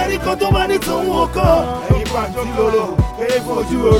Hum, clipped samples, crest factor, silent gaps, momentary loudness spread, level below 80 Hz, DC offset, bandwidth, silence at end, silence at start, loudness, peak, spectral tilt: none; under 0.1%; 16 dB; none; 5 LU; -26 dBFS; under 0.1%; 17 kHz; 0 s; 0 s; -17 LUFS; 0 dBFS; -6 dB/octave